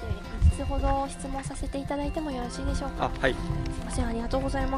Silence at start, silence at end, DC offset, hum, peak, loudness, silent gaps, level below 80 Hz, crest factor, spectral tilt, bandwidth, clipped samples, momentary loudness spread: 0 s; 0 s; under 0.1%; none; -8 dBFS; -30 LUFS; none; -32 dBFS; 20 dB; -6 dB/octave; 12 kHz; under 0.1%; 8 LU